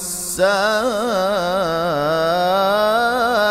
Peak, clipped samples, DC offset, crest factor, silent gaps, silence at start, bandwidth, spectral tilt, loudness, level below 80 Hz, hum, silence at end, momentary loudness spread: -4 dBFS; under 0.1%; under 0.1%; 14 dB; none; 0 s; 16 kHz; -3 dB/octave; -17 LUFS; -48 dBFS; none; 0 s; 3 LU